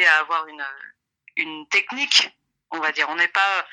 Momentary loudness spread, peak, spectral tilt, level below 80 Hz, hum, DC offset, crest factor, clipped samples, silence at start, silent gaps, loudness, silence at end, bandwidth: 16 LU; -2 dBFS; 1 dB/octave; -82 dBFS; none; under 0.1%; 22 dB; under 0.1%; 0 s; none; -20 LUFS; 0.05 s; 12 kHz